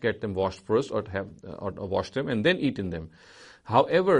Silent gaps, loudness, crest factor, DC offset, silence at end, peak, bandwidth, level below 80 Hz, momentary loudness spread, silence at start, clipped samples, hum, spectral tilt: none; -27 LUFS; 22 dB; under 0.1%; 0 s; -6 dBFS; 10.5 kHz; -56 dBFS; 14 LU; 0 s; under 0.1%; none; -6.5 dB/octave